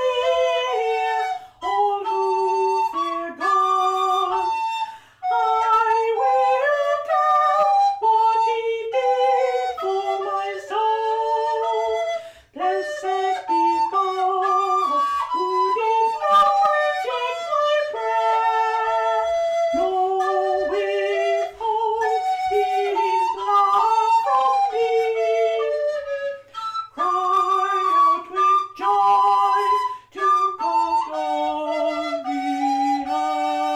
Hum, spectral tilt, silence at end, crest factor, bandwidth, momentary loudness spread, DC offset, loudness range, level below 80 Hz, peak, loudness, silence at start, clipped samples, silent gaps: none; -2.5 dB/octave; 0 s; 10 dB; 14 kHz; 8 LU; under 0.1%; 3 LU; -64 dBFS; -10 dBFS; -20 LUFS; 0 s; under 0.1%; none